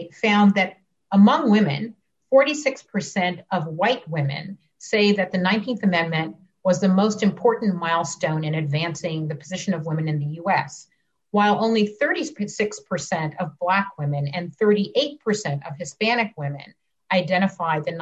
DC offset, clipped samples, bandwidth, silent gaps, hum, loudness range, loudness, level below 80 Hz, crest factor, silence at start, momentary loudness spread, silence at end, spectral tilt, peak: under 0.1%; under 0.1%; 8.2 kHz; none; none; 4 LU; -22 LUFS; -66 dBFS; 16 dB; 0 s; 11 LU; 0 s; -5.5 dB/octave; -6 dBFS